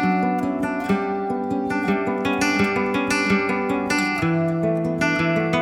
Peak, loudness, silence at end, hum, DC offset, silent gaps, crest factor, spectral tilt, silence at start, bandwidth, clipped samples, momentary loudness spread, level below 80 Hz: -6 dBFS; -21 LUFS; 0 s; none; under 0.1%; none; 14 dB; -5.5 dB/octave; 0 s; 17 kHz; under 0.1%; 4 LU; -52 dBFS